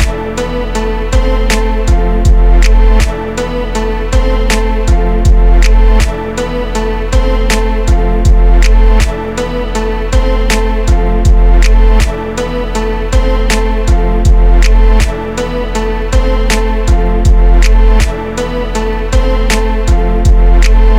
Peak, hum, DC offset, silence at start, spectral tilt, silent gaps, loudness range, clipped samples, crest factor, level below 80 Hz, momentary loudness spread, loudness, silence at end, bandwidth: 0 dBFS; none; 2%; 0 s; -5.5 dB/octave; none; 0 LU; 0.8%; 8 dB; -8 dBFS; 7 LU; -12 LUFS; 0 s; 11.5 kHz